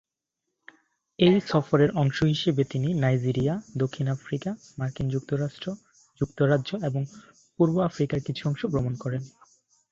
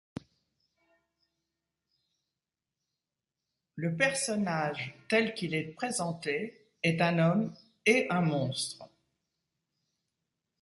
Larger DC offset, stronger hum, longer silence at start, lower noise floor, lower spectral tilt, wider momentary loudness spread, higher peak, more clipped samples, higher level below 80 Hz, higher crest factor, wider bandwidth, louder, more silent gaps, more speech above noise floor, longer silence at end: neither; neither; second, 1.2 s vs 3.75 s; second, -84 dBFS vs -90 dBFS; first, -7.5 dB/octave vs -5 dB/octave; about the same, 11 LU vs 12 LU; first, -6 dBFS vs -12 dBFS; neither; first, -56 dBFS vs -72 dBFS; about the same, 20 dB vs 22 dB; second, 7.6 kHz vs 11.5 kHz; first, -26 LUFS vs -30 LUFS; neither; about the same, 59 dB vs 60 dB; second, 0.6 s vs 1.75 s